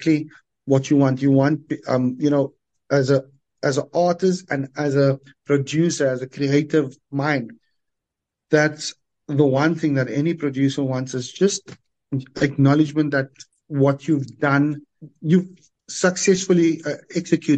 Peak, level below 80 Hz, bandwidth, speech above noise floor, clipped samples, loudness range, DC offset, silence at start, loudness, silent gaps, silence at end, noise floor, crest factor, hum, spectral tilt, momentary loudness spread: -2 dBFS; -64 dBFS; 9 kHz; 64 dB; under 0.1%; 2 LU; under 0.1%; 0 s; -21 LUFS; none; 0 s; -84 dBFS; 18 dB; none; -6 dB/octave; 11 LU